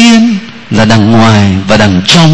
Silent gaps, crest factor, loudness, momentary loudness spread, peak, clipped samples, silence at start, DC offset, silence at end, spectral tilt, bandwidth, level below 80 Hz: none; 6 dB; -6 LUFS; 7 LU; 0 dBFS; 5%; 0 s; under 0.1%; 0 s; -5 dB/octave; 11 kHz; -32 dBFS